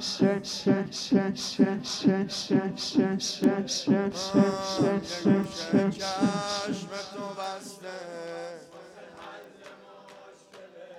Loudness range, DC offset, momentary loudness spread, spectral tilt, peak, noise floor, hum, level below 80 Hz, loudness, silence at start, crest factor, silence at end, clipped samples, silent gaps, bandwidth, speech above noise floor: 14 LU; under 0.1%; 19 LU; -5 dB/octave; -8 dBFS; -50 dBFS; none; -66 dBFS; -27 LUFS; 0 s; 20 dB; 0 s; under 0.1%; none; 13 kHz; 23 dB